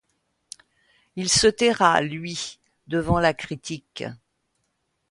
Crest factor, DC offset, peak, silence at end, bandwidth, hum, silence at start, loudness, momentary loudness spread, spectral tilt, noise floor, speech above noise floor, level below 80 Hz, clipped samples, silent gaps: 22 dB; under 0.1%; -2 dBFS; 0.95 s; 11.5 kHz; none; 1.15 s; -22 LUFS; 23 LU; -3.5 dB/octave; -74 dBFS; 52 dB; -48 dBFS; under 0.1%; none